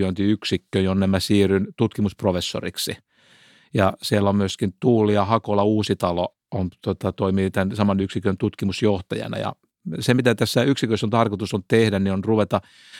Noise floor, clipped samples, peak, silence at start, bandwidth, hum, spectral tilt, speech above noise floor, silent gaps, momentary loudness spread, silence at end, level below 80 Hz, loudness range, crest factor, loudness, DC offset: -54 dBFS; under 0.1%; -4 dBFS; 0 s; 16 kHz; none; -6 dB/octave; 33 dB; none; 9 LU; 0 s; -54 dBFS; 2 LU; 18 dB; -22 LUFS; under 0.1%